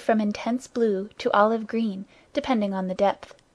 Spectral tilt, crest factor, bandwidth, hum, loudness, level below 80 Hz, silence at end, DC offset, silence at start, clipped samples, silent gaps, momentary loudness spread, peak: -6 dB/octave; 20 dB; 10.5 kHz; none; -25 LUFS; -62 dBFS; 0.2 s; under 0.1%; 0 s; under 0.1%; none; 10 LU; -6 dBFS